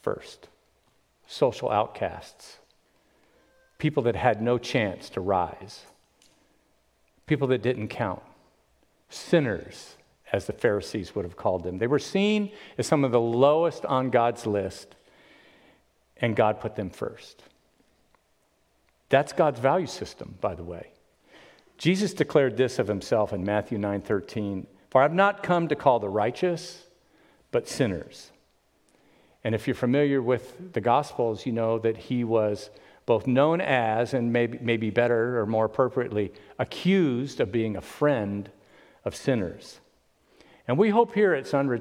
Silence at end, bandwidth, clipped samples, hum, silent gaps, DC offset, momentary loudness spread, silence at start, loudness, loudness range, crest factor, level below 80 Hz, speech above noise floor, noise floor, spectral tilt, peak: 0 s; 15.5 kHz; under 0.1%; none; none; under 0.1%; 14 LU; 0.05 s; -26 LUFS; 7 LU; 22 dB; -60 dBFS; 43 dB; -68 dBFS; -6.5 dB/octave; -6 dBFS